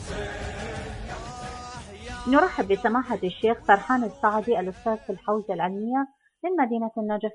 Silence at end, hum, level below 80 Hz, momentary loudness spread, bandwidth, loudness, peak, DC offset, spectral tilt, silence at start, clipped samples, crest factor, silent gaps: 0 s; none; -46 dBFS; 16 LU; 10.5 kHz; -26 LUFS; -4 dBFS; under 0.1%; -6 dB/octave; 0 s; under 0.1%; 22 dB; none